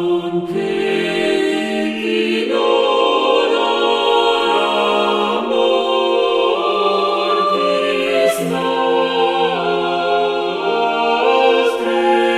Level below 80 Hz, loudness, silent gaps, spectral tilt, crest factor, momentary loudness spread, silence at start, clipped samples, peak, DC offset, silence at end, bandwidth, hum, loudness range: -54 dBFS; -16 LUFS; none; -4.5 dB/octave; 14 dB; 4 LU; 0 s; under 0.1%; -2 dBFS; under 0.1%; 0 s; 14.5 kHz; none; 2 LU